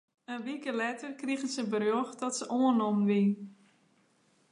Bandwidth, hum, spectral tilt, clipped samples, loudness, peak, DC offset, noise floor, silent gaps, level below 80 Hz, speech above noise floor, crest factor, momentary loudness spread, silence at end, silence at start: 11 kHz; none; -5.5 dB/octave; under 0.1%; -31 LUFS; -16 dBFS; under 0.1%; -69 dBFS; none; -84 dBFS; 38 dB; 16 dB; 12 LU; 1 s; 0.3 s